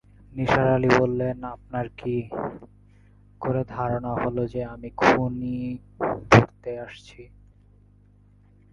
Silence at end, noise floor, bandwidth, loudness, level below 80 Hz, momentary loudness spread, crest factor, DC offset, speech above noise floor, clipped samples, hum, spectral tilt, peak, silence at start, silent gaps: 1.45 s; -55 dBFS; 9.2 kHz; -24 LUFS; -48 dBFS; 17 LU; 26 dB; under 0.1%; 31 dB; under 0.1%; 50 Hz at -45 dBFS; -7 dB/octave; 0 dBFS; 0.35 s; none